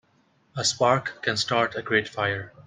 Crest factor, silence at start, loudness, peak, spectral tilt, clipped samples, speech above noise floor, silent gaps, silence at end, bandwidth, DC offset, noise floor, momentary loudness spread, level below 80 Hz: 22 dB; 0.55 s; -24 LUFS; -6 dBFS; -3 dB/octave; under 0.1%; 39 dB; none; 0.05 s; 10 kHz; under 0.1%; -64 dBFS; 5 LU; -64 dBFS